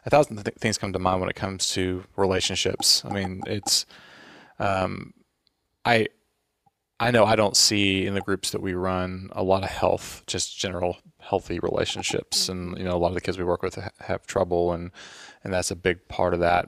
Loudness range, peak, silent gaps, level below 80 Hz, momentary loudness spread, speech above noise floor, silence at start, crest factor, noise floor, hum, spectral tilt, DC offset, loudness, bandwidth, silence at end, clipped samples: 5 LU; -2 dBFS; none; -50 dBFS; 12 LU; 47 dB; 0.05 s; 22 dB; -72 dBFS; none; -3.5 dB/octave; under 0.1%; -24 LUFS; 15.5 kHz; 0 s; under 0.1%